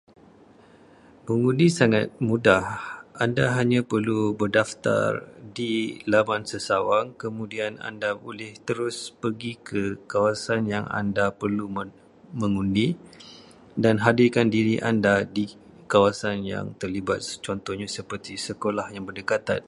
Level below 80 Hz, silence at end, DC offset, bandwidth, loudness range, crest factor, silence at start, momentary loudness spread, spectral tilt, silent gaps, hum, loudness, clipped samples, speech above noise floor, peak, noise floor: -56 dBFS; 0.05 s; under 0.1%; 11.5 kHz; 6 LU; 22 dB; 1.25 s; 14 LU; -6 dB/octave; none; none; -25 LUFS; under 0.1%; 28 dB; -2 dBFS; -53 dBFS